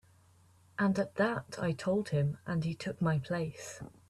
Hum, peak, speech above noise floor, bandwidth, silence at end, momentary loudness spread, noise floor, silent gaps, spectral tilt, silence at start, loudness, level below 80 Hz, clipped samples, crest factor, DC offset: none; -18 dBFS; 30 dB; 12.5 kHz; 0.2 s; 8 LU; -63 dBFS; none; -7 dB/octave; 0.8 s; -34 LUFS; -64 dBFS; under 0.1%; 16 dB; under 0.1%